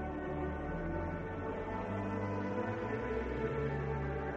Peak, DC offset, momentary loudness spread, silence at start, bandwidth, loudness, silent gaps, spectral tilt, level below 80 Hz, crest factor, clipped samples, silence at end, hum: -24 dBFS; under 0.1%; 3 LU; 0 s; 7.8 kHz; -38 LUFS; none; -8.5 dB/octave; -48 dBFS; 14 dB; under 0.1%; 0 s; none